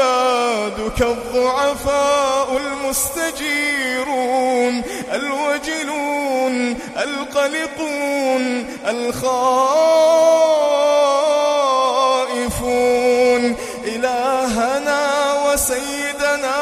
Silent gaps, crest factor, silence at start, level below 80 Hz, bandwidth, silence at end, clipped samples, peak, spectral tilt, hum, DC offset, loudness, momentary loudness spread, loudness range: none; 14 dB; 0 s; -42 dBFS; 15.5 kHz; 0 s; under 0.1%; -4 dBFS; -2.5 dB/octave; none; under 0.1%; -17 LUFS; 8 LU; 5 LU